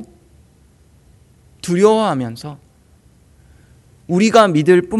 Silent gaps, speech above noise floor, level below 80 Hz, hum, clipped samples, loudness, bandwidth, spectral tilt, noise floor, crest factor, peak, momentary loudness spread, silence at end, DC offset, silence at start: none; 37 dB; -52 dBFS; none; under 0.1%; -14 LUFS; 12 kHz; -6 dB/octave; -51 dBFS; 18 dB; 0 dBFS; 19 LU; 0 s; under 0.1%; 0 s